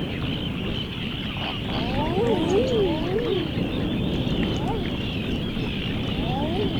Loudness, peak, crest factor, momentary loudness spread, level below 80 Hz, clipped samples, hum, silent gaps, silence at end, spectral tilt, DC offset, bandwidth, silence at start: -25 LUFS; -8 dBFS; 16 dB; 6 LU; -36 dBFS; under 0.1%; none; none; 0 s; -7 dB/octave; under 0.1%; over 20 kHz; 0 s